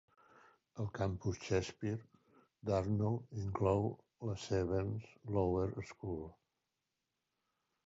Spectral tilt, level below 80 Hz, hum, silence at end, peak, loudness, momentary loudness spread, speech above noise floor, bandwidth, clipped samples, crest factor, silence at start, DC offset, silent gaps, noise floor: -7.5 dB/octave; -56 dBFS; none; 1.55 s; -20 dBFS; -39 LUFS; 11 LU; 51 dB; 7.6 kHz; under 0.1%; 20 dB; 0.75 s; under 0.1%; none; -88 dBFS